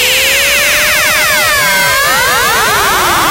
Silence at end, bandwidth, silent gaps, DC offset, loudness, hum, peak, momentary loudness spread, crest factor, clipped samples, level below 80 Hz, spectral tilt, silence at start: 0 s; 16.5 kHz; none; under 0.1%; -8 LUFS; none; 0 dBFS; 2 LU; 8 dB; under 0.1%; -34 dBFS; -0.5 dB/octave; 0 s